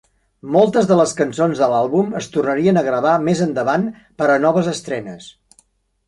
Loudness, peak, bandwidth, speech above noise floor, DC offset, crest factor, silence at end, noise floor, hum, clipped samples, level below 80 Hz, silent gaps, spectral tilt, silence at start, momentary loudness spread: -17 LUFS; -2 dBFS; 11.5 kHz; 41 dB; under 0.1%; 16 dB; 0.8 s; -58 dBFS; none; under 0.1%; -58 dBFS; none; -6 dB/octave; 0.45 s; 12 LU